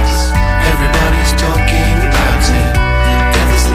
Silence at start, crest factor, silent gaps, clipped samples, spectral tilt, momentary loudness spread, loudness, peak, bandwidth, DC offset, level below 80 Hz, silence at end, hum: 0 s; 10 dB; none; under 0.1%; -4.5 dB/octave; 1 LU; -12 LUFS; 0 dBFS; 15.5 kHz; under 0.1%; -12 dBFS; 0 s; none